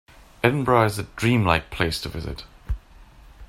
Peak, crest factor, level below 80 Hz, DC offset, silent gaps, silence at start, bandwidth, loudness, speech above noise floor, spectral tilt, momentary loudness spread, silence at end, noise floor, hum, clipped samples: 0 dBFS; 24 dB; -38 dBFS; under 0.1%; none; 0.45 s; 16 kHz; -22 LUFS; 26 dB; -6 dB/octave; 16 LU; 0.05 s; -48 dBFS; none; under 0.1%